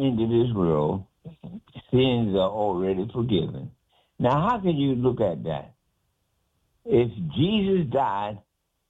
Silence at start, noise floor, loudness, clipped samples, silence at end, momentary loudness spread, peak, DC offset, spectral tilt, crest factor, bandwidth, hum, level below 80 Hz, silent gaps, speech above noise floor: 0 s; -73 dBFS; -24 LUFS; under 0.1%; 0.5 s; 19 LU; -10 dBFS; under 0.1%; -9.5 dB/octave; 16 dB; 7.6 kHz; none; -52 dBFS; none; 49 dB